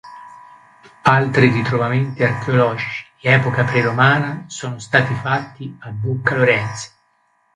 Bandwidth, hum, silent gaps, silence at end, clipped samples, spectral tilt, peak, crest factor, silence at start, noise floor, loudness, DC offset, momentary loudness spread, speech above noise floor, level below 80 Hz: 10.5 kHz; none; none; 0.7 s; under 0.1%; -6 dB/octave; 0 dBFS; 18 dB; 0.05 s; -62 dBFS; -17 LUFS; under 0.1%; 14 LU; 44 dB; -54 dBFS